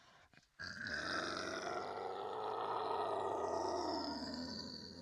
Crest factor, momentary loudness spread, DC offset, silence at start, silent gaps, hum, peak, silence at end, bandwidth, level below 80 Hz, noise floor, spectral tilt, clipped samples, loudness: 16 dB; 6 LU; under 0.1%; 0 s; none; none; -26 dBFS; 0 s; 13.5 kHz; -74 dBFS; -67 dBFS; -3.5 dB/octave; under 0.1%; -42 LUFS